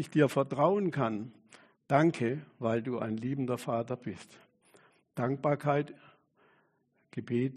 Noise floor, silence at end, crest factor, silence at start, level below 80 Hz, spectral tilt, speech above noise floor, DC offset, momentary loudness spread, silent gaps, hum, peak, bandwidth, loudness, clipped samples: -73 dBFS; 0 s; 22 dB; 0 s; -72 dBFS; -7.5 dB/octave; 42 dB; under 0.1%; 16 LU; none; none; -12 dBFS; 13 kHz; -31 LUFS; under 0.1%